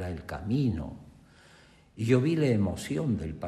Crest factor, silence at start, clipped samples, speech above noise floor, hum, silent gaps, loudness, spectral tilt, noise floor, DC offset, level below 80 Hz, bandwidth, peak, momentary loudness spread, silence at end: 20 dB; 0 s; under 0.1%; 29 dB; none; none; -29 LUFS; -7.5 dB/octave; -57 dBFS; under 0.1%; -52 dBFS; 13.5 kHz; -10 dBFS; 12 LU; 0 s